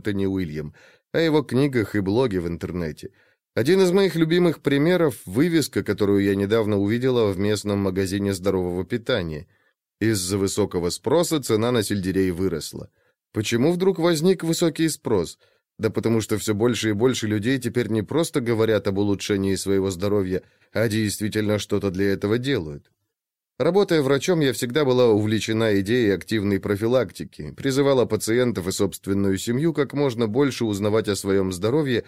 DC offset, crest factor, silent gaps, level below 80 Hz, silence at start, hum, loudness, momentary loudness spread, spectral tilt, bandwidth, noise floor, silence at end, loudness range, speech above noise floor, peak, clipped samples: under 0.1%; 14 dB; none; -54 dBFS; 0.05 s; none; -22 LUFS; 7 LU; -5.5 dB/octave; 16 kHz; -85 dBFS; 0.05 s; 3 LU; 64 dB; -8 dBFS; under 0.1%